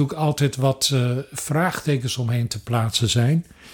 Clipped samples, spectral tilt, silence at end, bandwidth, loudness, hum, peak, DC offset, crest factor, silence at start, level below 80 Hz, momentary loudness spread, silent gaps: under 0.1%; -5 dB/octave; 0 s; 18.5 kHz; -22 LUFS; none; -6 dBFS; under 0.1%; 16 dB; 0 s; -52 dBFS; 6 LU; none